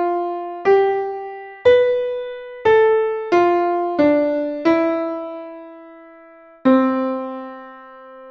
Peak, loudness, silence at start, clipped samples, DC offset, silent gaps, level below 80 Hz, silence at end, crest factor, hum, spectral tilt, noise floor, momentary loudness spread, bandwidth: -2 dBFS; -18 LUFS; 0 s; under 0.1%; under 0.1%; none; -58 dBFS; 0 s; 16 dB; none; -6.5 dB/octave; -45 dBFS; 18 LU; 6.8 kHz